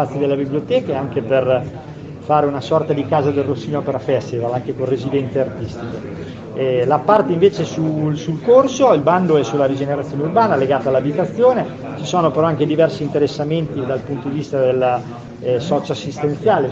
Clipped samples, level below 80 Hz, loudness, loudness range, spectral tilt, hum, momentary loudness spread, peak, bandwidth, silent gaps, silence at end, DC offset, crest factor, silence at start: under 0.1%; -52 dBFS; -17 LUFS; 5 LU; -7 dB/octave; none; 10 LU; 0 dBFS; 7.8 kHz; none; 0 s; under 0.1%; 16 dB; 0 s